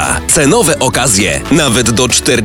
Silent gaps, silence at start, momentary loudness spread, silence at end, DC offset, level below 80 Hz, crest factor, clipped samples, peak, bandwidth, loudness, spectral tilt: none; 0 s; 2 LU; 0 s; under 0.1%; -28 dBFS; 10 dB; under 0.1%; 0 dBFS; 19 kHz; -9 LUFS; -3 dB/octave